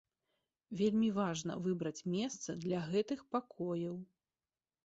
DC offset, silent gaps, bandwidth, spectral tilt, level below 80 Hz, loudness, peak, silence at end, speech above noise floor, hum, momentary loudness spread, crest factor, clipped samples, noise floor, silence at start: under 0.1%; none; 8 kHz; -6.5 dB/octave; -74 dBFS; -38 LUFS; -22 dBFS; 0.8 s; over 53 dB; none; 8 LU; 18 dB; under 0.1%; under -90 dBFS; 0.7 s